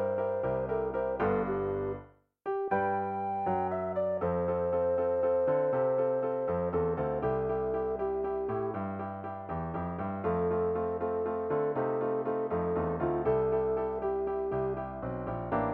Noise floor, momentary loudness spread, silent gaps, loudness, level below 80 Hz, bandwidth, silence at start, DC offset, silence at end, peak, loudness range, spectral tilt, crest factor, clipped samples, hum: -51 dBFS; 8 LU; none; -32 LUFS; -54 dBFS; 4.1 kHz; 0 s; under 0.1%; 0 s; -18 dBFS; 4 LU; -11 dB/octave; 14 dB; under 0.1%; none